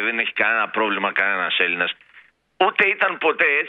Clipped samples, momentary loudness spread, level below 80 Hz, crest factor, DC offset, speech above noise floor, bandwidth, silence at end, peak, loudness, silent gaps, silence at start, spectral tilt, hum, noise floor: under 0.1%; 5 LU; -72 dBFS; 18 dB; under 0.1%; 32 dB; 6 kHz; 0 s; -2 dBFS; -19 LUFS; none; 0 s; -5.5 dB/octave; none; -52 dBFS